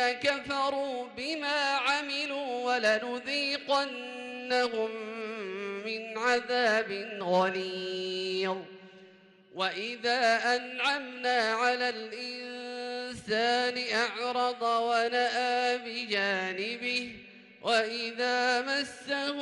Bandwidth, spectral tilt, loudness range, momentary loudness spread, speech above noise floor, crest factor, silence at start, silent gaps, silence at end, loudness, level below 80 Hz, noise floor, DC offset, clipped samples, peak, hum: 12 kHz; -3 dB/octave; 2 LU; 10 LU; 27 dB; 14 dB; 0 s; none; 0 s; -30 LUFS; -74 dBFS; -57 dBFS; under 0.1%; under 0.1%; -16 dBFS; none